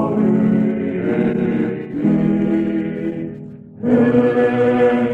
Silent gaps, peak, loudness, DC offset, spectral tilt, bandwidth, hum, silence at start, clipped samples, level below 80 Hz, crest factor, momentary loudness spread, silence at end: none; -2 dBFS; -17 LUFS; under 0.1%; -9.5 dB/octave; 4.4 kHz; none; 0 s; under 0.1%; -50 dBFS; 14 dB; 11 LU; 0 s